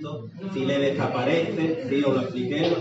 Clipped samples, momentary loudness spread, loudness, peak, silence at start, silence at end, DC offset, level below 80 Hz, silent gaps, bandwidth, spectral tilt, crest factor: under 0.1%; 8 LU; -25 LUFS; -8 dBFS; 0 s; 0 s; under 0.1%; -68 dBFS; none; 8 kHz; -5 dB/octave; 16 dB